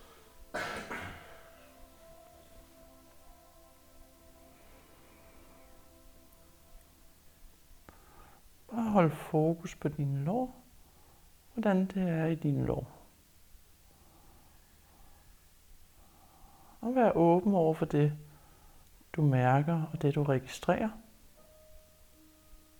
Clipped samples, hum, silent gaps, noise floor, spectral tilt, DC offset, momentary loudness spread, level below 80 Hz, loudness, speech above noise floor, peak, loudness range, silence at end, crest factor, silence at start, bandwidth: under 0.1%; none; none; -60 dBFS; -8 dB/octave; under 0.1%; 16 LU; -58 dBFS; -31 LUFS; 31 dB; -12 dBFS; 15 LU; 0.25 s; 24 dB; 0.35 s; over 20 kHz